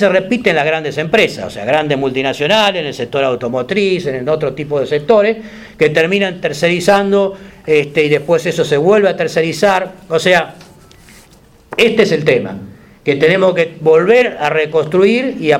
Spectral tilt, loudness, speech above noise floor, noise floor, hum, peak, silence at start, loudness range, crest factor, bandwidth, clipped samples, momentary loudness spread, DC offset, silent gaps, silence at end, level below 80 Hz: -5 dB/octave; -13 LUFS; 31 dB; -44 dBFS; none; 0 dBFS; 0 s; 2 LU; 14 dB; 15 kHz; under 0.1%; 7 LU; under 0.1%; none; 0 s; -50 dBFS